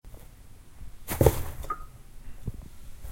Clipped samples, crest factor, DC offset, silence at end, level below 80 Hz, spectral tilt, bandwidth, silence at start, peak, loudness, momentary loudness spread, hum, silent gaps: under 0.1%; 30 dB; under 0.1%; 0 s; -38 dBFS; -6 dB/octave; 16.5 kHz; 0.05 s; -2 dBFS; -30 LUFS; 27 LU; none; none